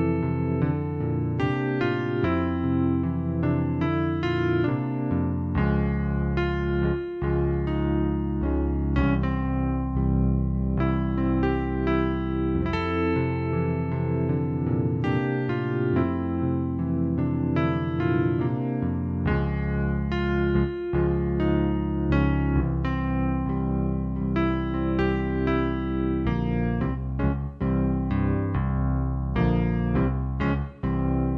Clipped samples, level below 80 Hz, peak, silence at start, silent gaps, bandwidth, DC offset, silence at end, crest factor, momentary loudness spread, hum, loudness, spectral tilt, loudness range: under 0.1%; -34 dBFS; -10 dBFS; 0 s; none; 5.8 kHz; under 0.1%; 0 s; 14 dB; 3 LU; none; -25 LUFS; -10 dB/octave; 1 LU